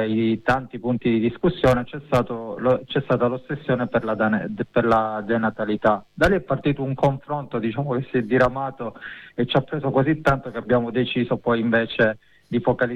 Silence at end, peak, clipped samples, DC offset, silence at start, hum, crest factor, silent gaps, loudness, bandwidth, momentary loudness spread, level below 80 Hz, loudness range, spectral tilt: 0 s; -6 dBFS; under 0.1%; under 0.1%; 0 s; none; 14 dB; none; -22 LUFS; 12 kHz; 7 LU; -44 dBFS; 2 LU; -7.5 dB/octave